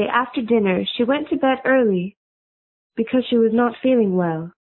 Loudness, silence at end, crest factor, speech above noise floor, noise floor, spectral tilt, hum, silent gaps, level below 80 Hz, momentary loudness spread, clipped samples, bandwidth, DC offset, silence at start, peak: -19 LUFS; 0.1 s; 16 dB; over 71 dB; under -90 dBFS; -11.5 dB/octave; none; 2.17-2.90 s; -58 dBFS; 7 LU; under 0.1%; 4.2 kHz; under 0.1%; 0 s; -2 dBFS